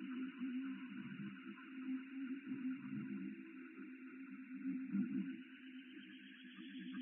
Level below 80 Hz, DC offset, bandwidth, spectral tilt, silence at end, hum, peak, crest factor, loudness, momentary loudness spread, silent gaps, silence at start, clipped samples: under -90 dBFS; under 0.1%; 3.7 kHz; -5.5 dB/octave; 0 s; none; -30 dBFS; 18 dB; -48 LUFS; 12 LU; none; 0 s; under 0.1%